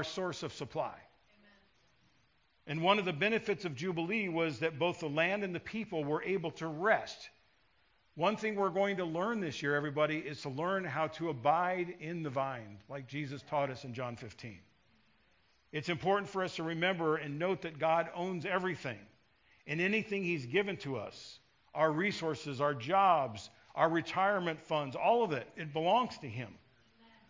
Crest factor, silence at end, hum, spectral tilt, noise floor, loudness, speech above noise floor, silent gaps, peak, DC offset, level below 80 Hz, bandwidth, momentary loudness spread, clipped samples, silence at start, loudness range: 22 dB; 0.7 s; none; -5.5 dB/octave; -73 dBFS; -34 LUFS; 38 dB; none; -14 dBFS; under 0.1%; -72 dBFS; 7.6 kHz; 12 LU; under 0.1%; 0 s; 5 LU